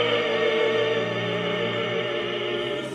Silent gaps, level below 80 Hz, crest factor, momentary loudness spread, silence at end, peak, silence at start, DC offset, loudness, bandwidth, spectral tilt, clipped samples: none; -64 dBFS; 14 dB; 5 LU; 0 s; -10 dBFS; 0 s; under 0.1%; -24 LUFS; 10.5 kHz; -5 dB/octave; under 0.1%